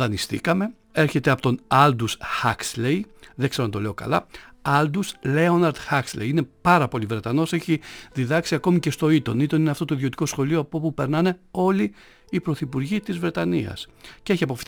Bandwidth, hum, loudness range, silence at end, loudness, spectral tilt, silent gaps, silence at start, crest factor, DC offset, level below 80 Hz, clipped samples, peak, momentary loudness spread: over 20 kHz; none; 3 LU; 0.05 s; -23 LUFS; -6 dB/octave; none; 0 s; 20 dB; under 0.1%; -52 dBFS; under 0.1%; -2 dBFS; 8 LU